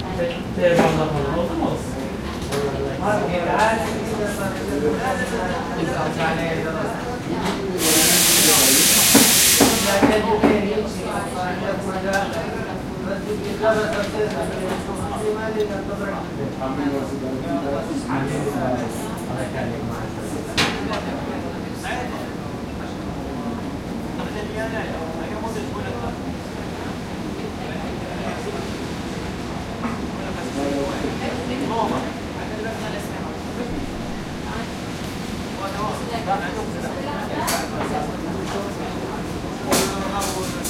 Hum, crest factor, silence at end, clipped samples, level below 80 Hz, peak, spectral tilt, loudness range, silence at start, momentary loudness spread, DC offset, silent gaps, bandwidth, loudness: none; 22 dB; 0 s; under 0.1%; -40 dBFS; 0 dBFS; -3.5 dB/octave; 14 LU; 0 s; 12 LU; under 0.1%; none; 16.5 kHz; -22 LUFS